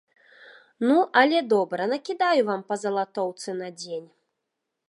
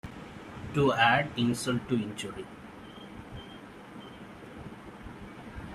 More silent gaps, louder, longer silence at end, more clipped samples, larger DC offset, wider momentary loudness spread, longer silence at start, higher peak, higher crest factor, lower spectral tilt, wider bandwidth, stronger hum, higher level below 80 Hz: neither; first, -24 LUFS vs -28 LUFS; first, 0.85 s vs 0 s; neither; neither; second, 14 LU vs 22 LU; first, 0.8 s vs 0.05 s; first, -4 dBFS vs -10 dBFS; about the same, 22 dB vs 24 dB; about the same, -4.5 dB/octave vs -5 dB/octave; second, 11.5 kHz vs 14.5 kHz; neither; second, -82 dBFS vs -56 dBFS